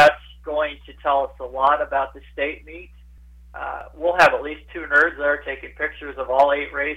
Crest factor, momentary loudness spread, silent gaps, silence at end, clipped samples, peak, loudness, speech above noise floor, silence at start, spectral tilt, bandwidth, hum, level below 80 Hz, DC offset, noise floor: 16 dB; 17 LU; none; 0 s; under 0.1%; -6 dBFS; -21 LUFS; 24 dB; 0 s; -4 dB/octave; 14 kHz; none; -46 dBFS; under 0.1%; -45 dBFS